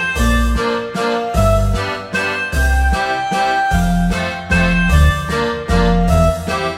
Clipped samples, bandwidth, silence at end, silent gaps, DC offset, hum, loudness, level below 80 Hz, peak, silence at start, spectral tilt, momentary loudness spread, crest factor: under 0.1%; 16 kHz; 0 s; none; under 0.1%; none; -16 LUFS; -20 dBFS; -2 dBFS; 0 s; -5.5 dB/octave; 5 LU; 14 dB